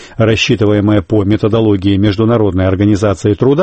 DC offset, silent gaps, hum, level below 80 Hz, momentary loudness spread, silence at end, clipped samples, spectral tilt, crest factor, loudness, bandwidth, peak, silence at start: under 0.1%; none; none; -36 dBFS; 2 LU; 0 s; under 0.1%; -7 dB/octave; 10 dB; -12 LUFS; 8.6 kHz; 0 dBFS; 0 s